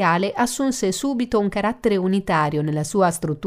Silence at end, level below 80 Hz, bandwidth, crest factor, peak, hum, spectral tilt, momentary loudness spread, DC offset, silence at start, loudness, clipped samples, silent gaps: 0 s; -48 dBFS; 16 kHz; 16 dB; -6 dBFS; none; -5 dB/octave; 3 LU; under 0.1%; 0 s; -21 LUFS; under 0.1%; none